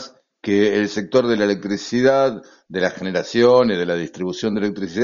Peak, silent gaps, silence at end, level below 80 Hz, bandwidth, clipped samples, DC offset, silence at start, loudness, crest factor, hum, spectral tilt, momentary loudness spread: -2 dBFS; none; 0 s; -56 dBFS; 7.4 kHz; under 0.1%; under 0.1%; 0 s; -19 LUFS; 16 dB; none; -4.5 dB/octave; 10 LU